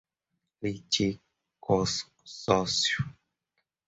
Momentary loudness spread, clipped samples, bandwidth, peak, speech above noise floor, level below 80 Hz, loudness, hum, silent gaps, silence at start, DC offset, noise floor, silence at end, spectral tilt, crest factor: 14 LU; under 0.1%; 8.4 kHz; -8 dBFS; 55 dB; -56 dBFS; -29 LUFS; none; none; 0.6 s; under 0.1%; -83 dBFS; 0.75 s; -3.5 dB/octave; 24 dB